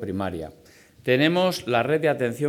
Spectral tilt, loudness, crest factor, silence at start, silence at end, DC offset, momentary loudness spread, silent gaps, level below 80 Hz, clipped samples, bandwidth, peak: -5.5 dB/octave; -23 LUFS; 16 dB; 0 s; 0 s; under 0.1%; 14 LU; none; -58 dBFS; under 0.1%; 18 kHz; -6 dBFS